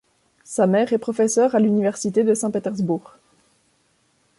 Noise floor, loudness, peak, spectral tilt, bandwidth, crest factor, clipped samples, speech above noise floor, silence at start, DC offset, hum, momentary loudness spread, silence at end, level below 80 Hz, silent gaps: -64 dBFS; -20 LUFS; -6 dBFS; -6 dB/octave; 11.5 kHz; 16 dB; under 0.1%; 45 dB; 0.5 s; under 0.1%; none; 7 LU; 1.4 s; -66 dBFS; none